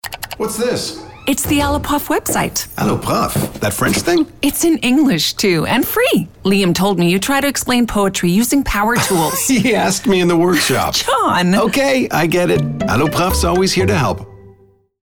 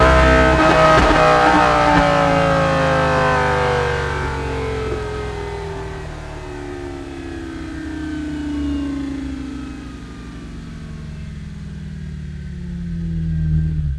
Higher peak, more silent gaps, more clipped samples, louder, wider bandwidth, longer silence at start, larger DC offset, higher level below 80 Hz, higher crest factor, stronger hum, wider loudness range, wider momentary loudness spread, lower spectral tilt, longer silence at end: about the same, -2 dBFS vs 0 dBFS; neither; neither; about the same, -15 LUFS vs -17 LUFS; first, over 20 kHz vs 12 kHz; about the same, 0.05 s vs 0 s; neither; second, -34 dBFS vs -28 dBFS; second, 12 dB vs 18 dB; neither; second, 3 LU vs 17 LU; second, 5 LU vs 20 LU; second, -4 dB/octave vs -6 dB/octave; first, 0.55 s vs 0 s